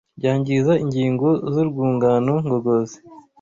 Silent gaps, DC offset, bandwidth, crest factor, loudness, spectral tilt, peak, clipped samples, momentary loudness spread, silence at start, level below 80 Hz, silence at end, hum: none; under 0.1%; 7.6 kHz; 14 dB; -20 LUFS; -8 dB/octave; -6 dBFS; under 0.1%; 4 LU; 0.15 s; -56 dBFS; 0.2 s; none